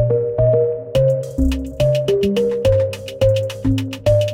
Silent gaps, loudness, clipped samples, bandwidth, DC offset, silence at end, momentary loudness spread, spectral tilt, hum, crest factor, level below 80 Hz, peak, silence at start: none; -18 LUFS; under 0.1%; 16.5 kHz; under 0.1%; 0 s; 4 LU; -7.5 dB/octave; none; 12 dB; -30 dBFS; -4 dBFS; 0 s